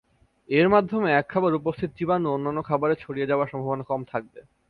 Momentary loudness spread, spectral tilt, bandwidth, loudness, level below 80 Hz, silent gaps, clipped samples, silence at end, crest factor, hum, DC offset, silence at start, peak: 10 LU; -9.5 dB/octave; 4.9 kHz; -24 LUFS; -58 dBFS; none; under 0.1%; 0.3 s; 18 dB; none; under 0.1%; 0.5 s; -6 dBFS